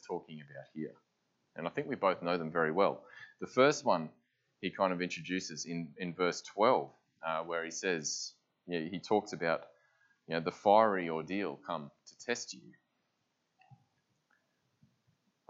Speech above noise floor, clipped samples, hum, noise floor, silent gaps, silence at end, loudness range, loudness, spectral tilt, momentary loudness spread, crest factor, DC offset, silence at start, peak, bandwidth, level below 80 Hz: 47 dB; under 0.1%; none; -81 dBFS; none; 1.75 s; 9 LU; -34 LUFS; -4 dB/octave; 17 LU; 24 dB; under 0.1%; 0.05 s; -12 dBFS; 8 kHz; -82 dBFS